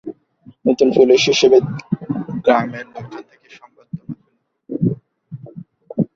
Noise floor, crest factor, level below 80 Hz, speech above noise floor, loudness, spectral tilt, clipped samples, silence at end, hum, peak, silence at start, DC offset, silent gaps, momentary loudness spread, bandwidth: -64 dBFS; 18 dB; -56 dBFS; 49 dB; -16 LUFS; -5.5 dB/octave; under 0.1%; 0.1 s; none; -2 dBFS; 0.05 s; under 0.1%; none; 24 LU; 7.6 kHz